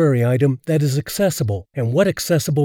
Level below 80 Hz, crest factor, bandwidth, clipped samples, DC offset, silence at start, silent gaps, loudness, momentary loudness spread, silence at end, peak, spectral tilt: -54 dBFS; 14 dB; 19 kHz; under 0.1%; under 0.1%; 0 s; none; -19 LUFS; 6 LU; 0 s; -4 dBFS; -6 dB/octave